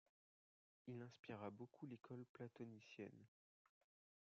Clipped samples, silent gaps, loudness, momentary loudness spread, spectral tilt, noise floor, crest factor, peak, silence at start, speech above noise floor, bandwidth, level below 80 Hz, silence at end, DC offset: under 0.1%; 1.19-1.23 s, 2.29-2.34 s; -58 LUFS; 4 LU; -6.5 dB/octave; under -90 dBFS; 20 dB; -40 dBFS; 0.85 s; over 33 dB; 7 kHz; under -90 dBFS; 0.95 s; under 0.1%